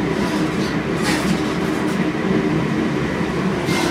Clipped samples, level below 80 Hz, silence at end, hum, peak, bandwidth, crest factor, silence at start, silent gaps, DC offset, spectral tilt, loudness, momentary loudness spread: under 0.1%; -40 dBFS; 0 s; none; -6 dBFS; 16 kHz; 12 dB; 0 s; none; under 0.1%; -5.5 dB/octave; -20 LUFS; 2 LU